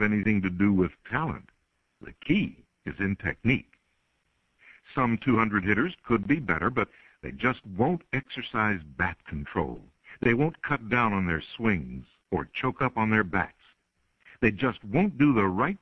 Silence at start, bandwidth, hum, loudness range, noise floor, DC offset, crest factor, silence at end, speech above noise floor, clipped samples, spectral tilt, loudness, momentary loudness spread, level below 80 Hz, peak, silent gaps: 0 s; 6.2 kHz; none; 3 LU; -73 dBFS; under 0.1%; 20 dB; 0.05 s; 46 dB; under 0.1%; -8.5 dB/octave; -27 LUFS; 11 LU; -50 dBFS; -8 dBFS; none